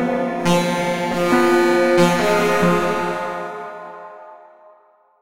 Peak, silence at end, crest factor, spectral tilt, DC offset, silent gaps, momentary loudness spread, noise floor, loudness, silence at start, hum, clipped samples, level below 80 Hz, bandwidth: -2 dBFS; 0.5 s; 16 dB; -5.5 dB/octave; under 0.1%; none; 18 LU; -54 dBFS; -17 LUFS; 0 s; none; under 0.1%; -50 dBFS; 16 kHz